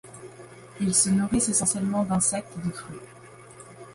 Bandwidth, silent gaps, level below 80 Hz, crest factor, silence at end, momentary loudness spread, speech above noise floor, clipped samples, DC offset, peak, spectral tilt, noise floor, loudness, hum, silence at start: 11.5 kHz; none; -52 dBFS; 20 dB; 0 s; 24 LU; 22 dB; under 0.1%; under 0.1%; -8 dBFS; -4 dB/octave; -47 dBFS; -24 LUFS; none; 0.05 s